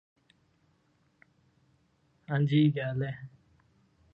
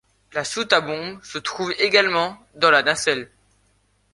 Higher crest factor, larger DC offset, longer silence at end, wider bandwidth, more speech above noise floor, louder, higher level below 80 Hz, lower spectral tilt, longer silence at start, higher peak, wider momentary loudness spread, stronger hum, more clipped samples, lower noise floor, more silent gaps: about the same, 18 dB vs 20 dB; neither; about the same, 0.85 s vs 0.9 s; second, 5 kHz vs 11.5 kHz; about the same, 43 dB vs 42 dB; second, -29 LUFS vs -20 LUFS; second, -70 dBFS vs -62 dBFS; first, -9.5 dB/octave vs -2 dB/octave; first, 2.3 s vs 0.35 s; second, -14 dBFS vs -2 dBFS; first, 18 LU vs 13 LU; second, none vs 50 Hz at -55 dBFS; neither; first, -70 dBFS vs -63 dBFS; neither